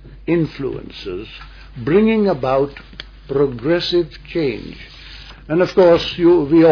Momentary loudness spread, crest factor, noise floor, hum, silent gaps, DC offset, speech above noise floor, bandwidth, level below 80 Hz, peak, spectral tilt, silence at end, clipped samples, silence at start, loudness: 23 LU; 16 dB; -37 dBFS; none; none; under 0.1%; 21 dB; 5.4 kHz; -40 dBFS; -2 dBFS; -7.5 dB/octave; 0 s; under 0.1%; 0.05 s; -17 LUFS